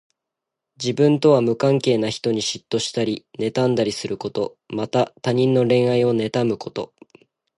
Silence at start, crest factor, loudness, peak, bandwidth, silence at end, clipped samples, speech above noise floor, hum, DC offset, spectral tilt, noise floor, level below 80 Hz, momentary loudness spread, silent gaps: 0.8 s; 16 dB; -20 LUFS; -4 dBFS; 11.5 kHz; 0.75 s; under 0.1%; 64 dB; none; under 0.1%; -6 dB/octave; -84 dBFS; -62 dBFS; 11 LU; none